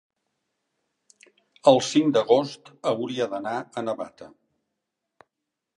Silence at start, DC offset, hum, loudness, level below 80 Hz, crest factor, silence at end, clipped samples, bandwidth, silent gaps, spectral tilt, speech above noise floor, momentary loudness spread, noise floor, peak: 1.65 s; under 0.1%; none; -24 LUFS; -76 dBFS; 24 dB; 1.5 s; under 0.1%; 11 kHz; none; -5 dB/octave; 60 dB; 13 LU; -84 dBFS; -2 dBFS